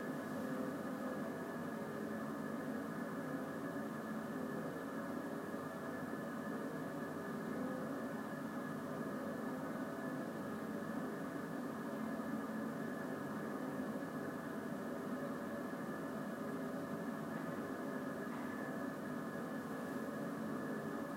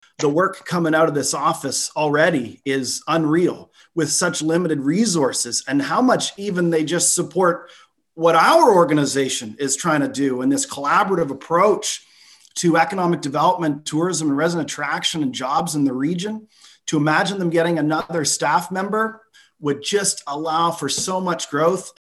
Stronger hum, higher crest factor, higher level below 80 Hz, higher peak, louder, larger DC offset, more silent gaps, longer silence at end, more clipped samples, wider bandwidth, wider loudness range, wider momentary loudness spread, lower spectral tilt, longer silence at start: neither; about the same, 14 dB vs 18 dB; second, -80 dBFS vs -64 dBFS; second, -30 dBFS vs -2 dBFS; second, -44 LUFS vs -19 LUFS; neither; neither; about the same, 0 s vs 0.1 s; neither; first, 16 kHz vs 13 kHz; second, 1 LU vs 4 LU; second, 2 LU vs 7 LU; first, -6.5 dB/octave vs -4 dB/octave; second, 0 s vs 0.2 s